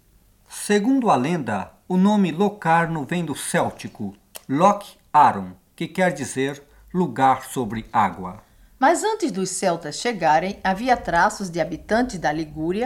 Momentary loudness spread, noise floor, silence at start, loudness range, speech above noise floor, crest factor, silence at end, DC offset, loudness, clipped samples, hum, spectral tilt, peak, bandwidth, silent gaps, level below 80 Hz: 13 LU; -56 dBFS; 0.5 s; 2 LU; 35 dB; 18 dB; 0 s; under 0.1%; -21 LUFS; under 0.1%; none; -5 dB/octave; -4 dBFS; 17 kHz; none; -50 dBFS